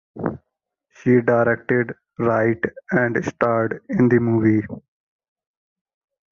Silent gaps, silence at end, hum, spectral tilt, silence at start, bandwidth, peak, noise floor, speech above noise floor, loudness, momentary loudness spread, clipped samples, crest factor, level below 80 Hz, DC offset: none; 1.55 s; none; -9 dB/octave; 0.15 s; 7 kHz; -4 dBFS; -79 dBFS; 60 dB; -20 LUFS; 12 LU; under 0.1%; 18 dB; -54 dBFS; under 0.1%